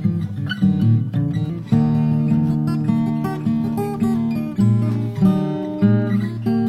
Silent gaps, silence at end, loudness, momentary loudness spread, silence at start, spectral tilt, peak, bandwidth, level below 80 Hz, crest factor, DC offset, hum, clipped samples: none; 0 s; -19 LUFS; 5 LU; 0 s; -9 dB/octave; -4 dBFS; 13.5 kHz; -48 dBFS; 14 dB; under 0.1%; none; under 0.1%